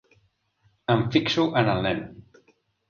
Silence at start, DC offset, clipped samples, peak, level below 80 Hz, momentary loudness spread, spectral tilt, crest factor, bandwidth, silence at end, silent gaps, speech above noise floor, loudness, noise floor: 0.9 s; under 0.1%; under 0.1%; -6 dBFS; -54 dBFS; 12 LU; -6.5 dB/octave; 22 dB; 7.2 kHz; 0.7 s; none; 44 dB; -24 LUFS; -67 dBFS